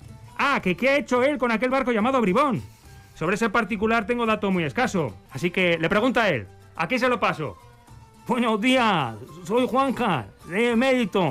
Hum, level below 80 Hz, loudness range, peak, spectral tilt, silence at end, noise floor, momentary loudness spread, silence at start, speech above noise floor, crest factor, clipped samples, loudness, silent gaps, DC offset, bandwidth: none; -52 dBFS; 2 LU; -12 dBFS; -5.5 dB/octave; 0 s; -48 dBFS; 10 LU; 0.05 s; 26 dB; 12 dB; under 0.1%; -23 LUFS; none; under 0.1%; 15.5 kHz